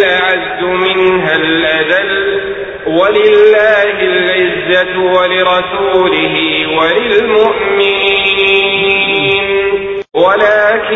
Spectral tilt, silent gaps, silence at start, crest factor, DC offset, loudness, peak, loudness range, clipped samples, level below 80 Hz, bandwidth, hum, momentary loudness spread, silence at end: -5.5 dB/octave; none; 0 s; 10 dB; under 0.1%; -10 LUFS; 0 dBFS; 1 LU; under 0.1%; -44 dBFS; 6.8 kHz; none; 5 LU; 0 s